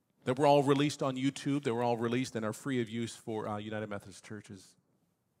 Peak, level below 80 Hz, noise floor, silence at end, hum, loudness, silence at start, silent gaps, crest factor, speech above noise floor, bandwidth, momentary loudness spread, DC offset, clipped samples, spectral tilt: -12 dBFS; -80 dBFS; -76 dBFS; 0.8 s; none; -32 LUFS; 0.25 s; none; 22 dB; 43 dB; 15.5 kHz; 21 LU; under 0.1%; under 0.1%; -6 dB/octave